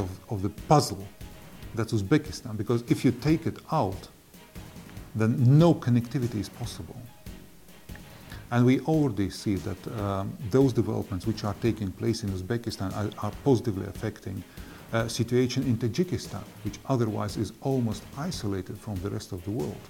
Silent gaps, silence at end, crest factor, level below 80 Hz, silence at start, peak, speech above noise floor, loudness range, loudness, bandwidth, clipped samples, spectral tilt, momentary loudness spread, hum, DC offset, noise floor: none; 0 s; 22 dB; -50 dBFS; 0 s; -6 dBFS; 25 dB; 4 LU; -28 LUFS; 17 kHz; under 0.1%; -7 dB/octave; 21 LU; none; under 0.1%; -52 dBFS